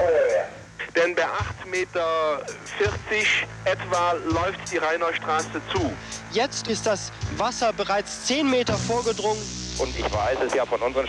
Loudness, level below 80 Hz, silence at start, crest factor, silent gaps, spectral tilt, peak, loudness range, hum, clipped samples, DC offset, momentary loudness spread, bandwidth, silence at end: -25 LUFS; -46 dBFS; 0 s; 16 dB; none; -3.5 dB/octave; -10 dBFS; 2 LU; none; under 0.1%; under 0.1%; 7 LU; 11.5 kHz; 0 s